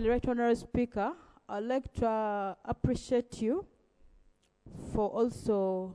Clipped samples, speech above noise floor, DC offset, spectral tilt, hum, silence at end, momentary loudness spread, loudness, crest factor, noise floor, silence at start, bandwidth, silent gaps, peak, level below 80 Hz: under 0.1%; 34 dB; under 0.1%; -7 dB/octave; none; 0 s; 8 LU; -33 LUFS; 18 dB; -66 dBFS; 0 s; 11 kHz; none; -14 dBFS; -50 dBFS